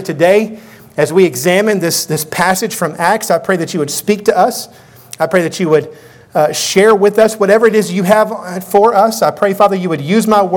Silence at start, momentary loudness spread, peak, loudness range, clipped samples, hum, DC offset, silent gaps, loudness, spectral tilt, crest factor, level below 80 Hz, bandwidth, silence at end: 0 s; 8 LU; 0 dBFS; 4 LU; 0.3%; none; under 0.1%; none; -12 LUFS; -4.5 dB/octave; 12 dB; -54 dBFS; 19.5 kHz; 0 s